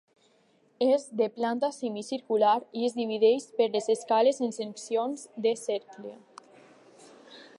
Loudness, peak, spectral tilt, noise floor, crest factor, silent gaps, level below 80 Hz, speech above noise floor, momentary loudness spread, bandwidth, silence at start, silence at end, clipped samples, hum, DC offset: -28 LUFS; -12 dBFS; -4 dB/octave; -65 dBFS; 18 dB; none; -88 dBFS; 38 dB; 11 LU; 11.5 kHz; 0.8 s; 0.15 s; under 0.1%; none; under 0.1%